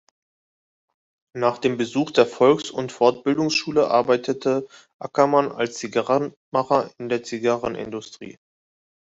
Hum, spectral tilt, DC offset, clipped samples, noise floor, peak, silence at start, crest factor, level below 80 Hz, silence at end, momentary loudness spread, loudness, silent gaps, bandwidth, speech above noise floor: none; -5 dB/octave; under 0.1%; under 0.1%; under -90 dBFS; -2 dBFS; 1.35 s; 20 dB; -64 dBFS; 0.8 s; 14 LU; -22 LUFS; 4.94-4.99 s, 6.37-6.52 s; 8 kHz; over 69 dB